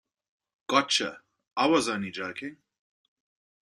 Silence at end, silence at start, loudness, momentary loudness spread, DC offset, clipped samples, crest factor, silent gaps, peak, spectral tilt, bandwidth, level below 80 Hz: 1.1 s; 0.7 s; -27 LUFS; 16 LU; under 0.1%; under 0.1%; 26 dB; none; -6 dBFS; -3 dB/octave; 12.5 kHz; -72 dBFS